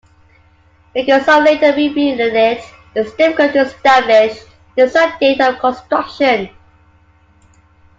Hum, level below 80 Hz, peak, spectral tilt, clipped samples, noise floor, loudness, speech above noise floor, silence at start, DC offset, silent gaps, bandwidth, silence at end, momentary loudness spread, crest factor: none; -52 dBFS; 0 dBFS; -4.5 dB/octave; under 0.1%; -50 dBFS; -13 LUFS; 37 dB; 0.95 s; under 0.1%; none; 7.8 kHz; 1.5 s; 12 LU; 14 dB